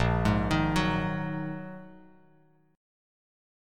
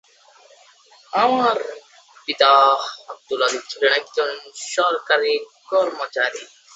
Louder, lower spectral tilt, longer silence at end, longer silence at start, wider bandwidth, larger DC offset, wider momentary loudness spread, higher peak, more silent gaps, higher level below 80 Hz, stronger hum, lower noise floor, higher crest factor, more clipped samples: second, -29 LUFS vs -19 LUFS; first, -6.5 dB/octave vs -1.5 dB/octave; first, 1.75 s vs 0.3 s; second, 0 s vs 1.15 s; first, 15.5 kHz vs 8.2 kHz; neither; about the same, 15 LU vs 16 LU; second, -12 dBFS vs -2 dBFS; neither; first, -42 dBFS vs -74 dBFS; neither; first, -63 dBFS vs -51 dBFS; about the same, 20 dB vs 20 dB; neither